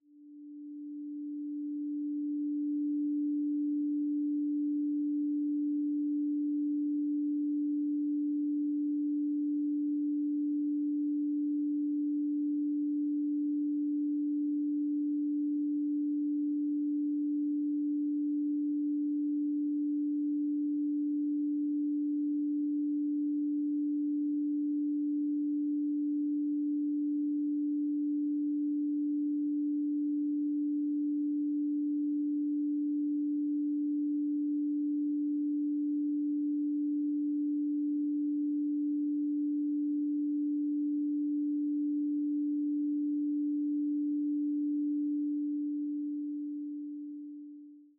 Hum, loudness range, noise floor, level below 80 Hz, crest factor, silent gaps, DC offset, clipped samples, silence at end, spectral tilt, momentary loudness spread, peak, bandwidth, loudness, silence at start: none; 0 LU; -52 dBFS; under -90 dBFS; 4 dB; none; under 0.1%; under 0.1%; 0.15 s; -12.5 dB/octave; 1 LU; -28 dBFS; 0.5 kHz; -33 LUFS; 0.15 s